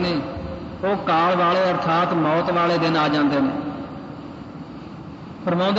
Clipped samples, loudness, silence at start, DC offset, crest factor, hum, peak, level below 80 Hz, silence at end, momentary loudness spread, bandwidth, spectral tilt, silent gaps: under 0.1%; -20 LUFS; 0 s; under 0.1%; 12 dB; none; -10 dBFS; -50 dBFS; 0 s; 18 LU; 7.8 kHz; -7 dB/octave; none